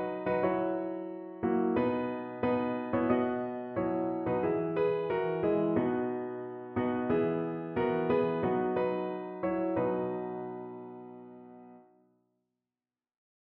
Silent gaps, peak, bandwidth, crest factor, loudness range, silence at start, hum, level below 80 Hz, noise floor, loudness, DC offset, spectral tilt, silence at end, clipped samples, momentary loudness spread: none; -14 dBFS; 4.3 kHz; 18 dB; 6 LU; 0 s; none; -64 dBFS; under -90 dBFS; -32 LUFS; under 0.1%; -6.5 dB/octave; 1.7 s; under 0.1%; 12 LU